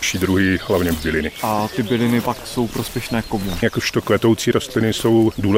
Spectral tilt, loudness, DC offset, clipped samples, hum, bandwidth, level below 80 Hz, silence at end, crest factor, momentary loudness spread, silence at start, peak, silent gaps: -5 dB/octave; -19 LUFS; under 0.1%; under 0.1%; none; 16 kHz; -40 dBFS; 0 s; 16 dB; 7 LU; 0 s; -2 dBFS; none